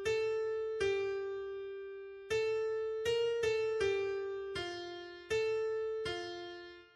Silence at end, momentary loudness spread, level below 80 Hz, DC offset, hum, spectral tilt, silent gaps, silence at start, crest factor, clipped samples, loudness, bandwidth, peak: 0.1 s; 12 LU; -66 dBFS; under 0.1%; none; -4 dB/octave; none; 0 s; 14 dB; under 0.1%; -36 LUFS; 12.5 kHz; -22 dBFS